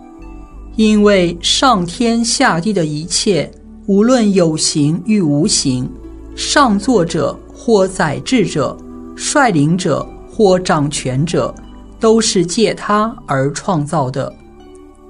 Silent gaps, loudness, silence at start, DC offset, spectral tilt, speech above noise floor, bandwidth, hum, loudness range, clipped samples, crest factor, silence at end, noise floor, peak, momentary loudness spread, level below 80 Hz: none; -14 LUFS; 0 s; under 0.1%; -4.5 dB/octave; 25 dB; 11 kHz; none; 2 LU; under 0.1%; 14 dB; 0.25 s; -38 dBFS; 0 dBFS; 11 LU; -38 dBFS